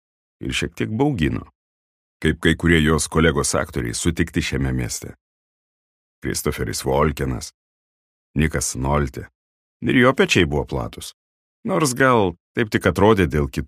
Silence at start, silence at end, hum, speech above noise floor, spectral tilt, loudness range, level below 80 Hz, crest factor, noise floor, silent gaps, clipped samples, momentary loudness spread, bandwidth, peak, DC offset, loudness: 0.4 s; 0 s; none; over 70 dB; -5 dB/octave; 6 LU; -34 dBFS; 20 dB; under -90 dBFS; 1.55-2.20 s, 5.21-6.22 s, 7.54-8.34 s, 9.35-9.80 s, 11.14-11.63 s, 12.40-12.55 s; under 0.1%; 14 LU; 15.5 kHz; 0 dBFS; under 0.1%; -20 LUFS